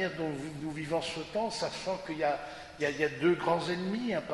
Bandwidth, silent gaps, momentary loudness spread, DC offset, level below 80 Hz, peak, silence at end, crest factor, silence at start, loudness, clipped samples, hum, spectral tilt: 11.5 kHz; none; 9 LU; under 0.1%; -62 dBFS; -16 dBFS; 0 s; 18 dB; 0 s; -33 LUFS; under 0.1%; none; -5 dB/octave